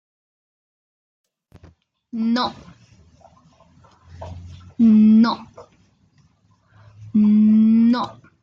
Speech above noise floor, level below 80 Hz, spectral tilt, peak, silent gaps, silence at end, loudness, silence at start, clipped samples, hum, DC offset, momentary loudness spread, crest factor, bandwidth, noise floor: 44 dB; -60 dBFS; -8 dB/octave; -6 dBFS; none; 0.3 s; -16 LUFS; 2.15 s; under 0.1%; none; under 0.1%; 24 LU; 14 dB; 6 kHz; -59 dBFS